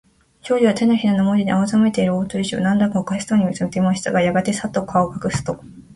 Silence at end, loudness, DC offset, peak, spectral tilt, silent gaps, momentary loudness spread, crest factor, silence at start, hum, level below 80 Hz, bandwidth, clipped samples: 0 s; -19 LUFS; under 0.1%; -2 dBFS; -6 dB/octave; none; 7 LU; 16 dB; 0.45 s; none; -50 dBFS; 11.5 kHz; under 0.1%